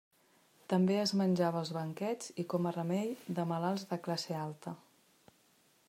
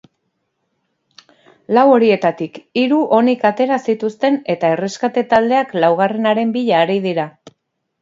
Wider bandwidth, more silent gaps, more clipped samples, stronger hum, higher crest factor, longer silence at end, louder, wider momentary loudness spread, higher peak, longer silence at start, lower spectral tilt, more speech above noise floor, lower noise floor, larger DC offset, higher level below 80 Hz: first, 15.5 kHz vs 7.8 kHz; neither; neither; neither; about the same, 18 dB vs 16 dB; first, 1.1 s vs 0.75 s; second, -35 LUFS vs -15 LUFS; about the same, 9 LU vs 8 LU; second, -18 dBFS vs 0 dBFS; second, 0.7 s vs 1.7 s; about the same, -6 dB/octave vs -6 dB/octave; second, 35 dB vs 55 dB; about the same, -69 dBFS vs -70 dBFS; neither; second, -80 dBFS vs -64 dBFS